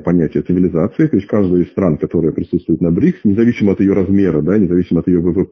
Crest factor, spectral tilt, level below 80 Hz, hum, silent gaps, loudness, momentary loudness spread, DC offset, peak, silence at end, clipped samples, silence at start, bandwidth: 12 dB; -10.5 dB/octave; -36 dBFS; none; none; -14 LUFS; 3 LU; under 0.1%; -2 dBFS; 0.05 s; under 0.1%; 0 s; 6.2 kHz